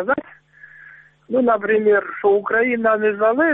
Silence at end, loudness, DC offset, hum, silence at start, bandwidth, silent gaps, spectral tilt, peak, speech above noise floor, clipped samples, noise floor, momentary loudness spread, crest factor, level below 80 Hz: 0 s; -18 LUFS; under 0.1%; none; 0 s; 3.9 kHz; none; -9.5 dB/octave; -6 dBFS; 28 dB; under 0.1%; -46 dBFS; 5 LU; 14 dB; -62 dBFS